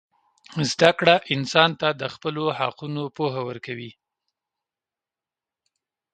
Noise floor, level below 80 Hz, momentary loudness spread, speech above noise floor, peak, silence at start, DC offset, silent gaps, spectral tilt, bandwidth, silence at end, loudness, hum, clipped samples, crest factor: under -90 dBFS; -66 dBFS; 16 LU; over 67 dB; 0 dBFS; 0.5 s; under 0.1%; none; -4.5 dB/octave; 9.4 kHz; 2.2 s; -22 LUFS; none; under 0.1%; 26 dB